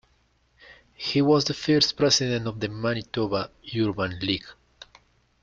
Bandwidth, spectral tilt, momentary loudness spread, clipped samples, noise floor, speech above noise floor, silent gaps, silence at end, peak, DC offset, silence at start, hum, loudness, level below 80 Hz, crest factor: 7.8 kHz; -4.5 dB/octave; 10 LU; under 0.1%; -65 dBFS; 41 dB; none; 0.9 s; -6 dBFS; under 0.1%; 0.7 s; none; -24 LUFS; -56 dBFS; 20 dB